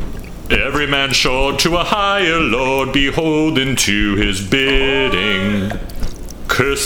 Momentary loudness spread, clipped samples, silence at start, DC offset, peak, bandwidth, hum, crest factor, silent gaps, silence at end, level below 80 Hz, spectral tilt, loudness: 12 LU; under 0.1%; 0 s; under 0.1%; 0 dBFS; 20 kHz; none; 16 dB; none; 0 s; -26 dBFS; -3.5 dB/octave; -15 LUFS